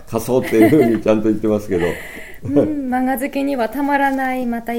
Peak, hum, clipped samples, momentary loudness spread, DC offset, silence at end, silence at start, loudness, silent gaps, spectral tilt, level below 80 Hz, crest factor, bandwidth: 0 dBFS; none; under 0.1%; 9 LU; under 0.1%; 0 s; 0 s; -17 LUFS; none; -6.5 dB/octave; -44 dBFS; 16 dB; 17 kHz